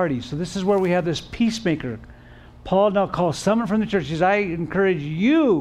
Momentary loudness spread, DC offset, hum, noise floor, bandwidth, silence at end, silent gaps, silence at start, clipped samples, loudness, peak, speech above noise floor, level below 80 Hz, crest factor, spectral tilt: 8 LU; under 0.1%; none; -45 dBFS; 12.5 kHz; 0 s; none; 0 s; under 0.1%; -21 LUFS; -8 dBFS; 24 dB; -48 dBFS; 14 dB; -6 dB/octave